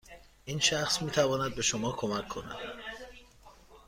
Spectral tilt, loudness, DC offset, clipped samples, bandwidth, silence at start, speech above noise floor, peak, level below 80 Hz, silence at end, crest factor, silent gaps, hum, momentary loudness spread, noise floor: -3 dB/octave; -30 LUFS; under 0.1%; under 0.1%; 16 kHz; 0.05 s; 25 dB; -12 dBFS; -56 dBFS; 0.1 s; 22 dB; none; none; 16 LU; -56 dBFS